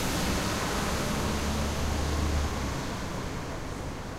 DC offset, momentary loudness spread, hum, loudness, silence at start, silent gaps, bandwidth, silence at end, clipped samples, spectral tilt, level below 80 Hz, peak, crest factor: under 0.1%; 8 LU; none; -31 LUFS; 0 s; none; 16 kHz; 0 s; under 0.1%; -4.5 dB/octave; -36 dBFS; -16 dBFS; 14 dB